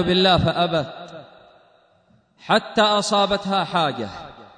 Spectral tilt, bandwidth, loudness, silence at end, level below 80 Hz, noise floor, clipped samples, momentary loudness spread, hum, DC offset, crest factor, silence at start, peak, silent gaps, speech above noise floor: -4.5 dB/octave; 9.6 kHz; -19 LUFS; 0.1 s; -48 dBFS; -59 dBFS; under 0.1%; 16 LU; none; under 0.1%; 18 dB; 0 s; -4 dBFS; none; 39 dB